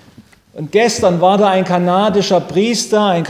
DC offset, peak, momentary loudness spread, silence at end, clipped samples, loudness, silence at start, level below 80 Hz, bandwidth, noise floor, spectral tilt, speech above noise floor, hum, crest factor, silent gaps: under 0.1%; 0 dBFS; 4 LU; 0 s; under 0.1%; -13 LUFS; 0.2 s; -48 dBFS; 16 kHz; -44 dBFS; -5 dB/octave; 31 dB; none; 14 dB; none